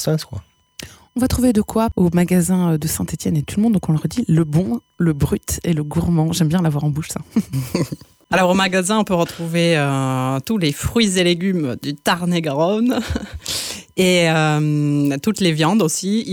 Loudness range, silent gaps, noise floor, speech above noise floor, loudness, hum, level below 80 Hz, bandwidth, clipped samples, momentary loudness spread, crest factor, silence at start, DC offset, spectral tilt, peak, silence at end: 2 LU; none; -39 dBFS; 21 dB; -18 LUFS; none; -40 dBFS; 18.5 kHz; under 0.1%; 8 LU; 14 dB; 0 s; under 0.1%; -5.5 dB/octave; -4 dBFS; 0 s